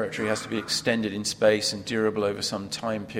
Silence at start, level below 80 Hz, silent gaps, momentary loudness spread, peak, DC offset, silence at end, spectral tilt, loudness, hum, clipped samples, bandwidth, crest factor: 0 s; -60 dBFS; none; 7 LU; -8 dBFS; under 0.1%; 0 s; -3.5 dB/octave; -26 LUFS; none; under 0.1%; 16 kHz; 18 dB